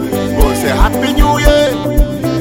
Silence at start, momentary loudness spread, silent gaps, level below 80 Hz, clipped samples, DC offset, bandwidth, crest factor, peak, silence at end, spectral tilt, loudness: 0 s; 5 LU; none; -14 dBFS; under 0.1%; under 0.1%; 17 kHz; 10 dB; 0 dBFS; 0 s; -5.5 dB/octave; -12 LUFS